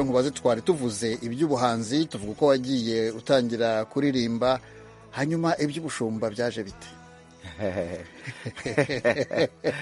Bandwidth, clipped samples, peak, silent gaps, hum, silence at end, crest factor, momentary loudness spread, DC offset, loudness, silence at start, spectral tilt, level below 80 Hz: 11.5 kHz; under 0.1%; -6 dBFS; none; none; 0 s; 20 dB; 13 LU; under 0.1%; -26 LUFS; 0 s; -5.5 dB/octave; -58 dBFS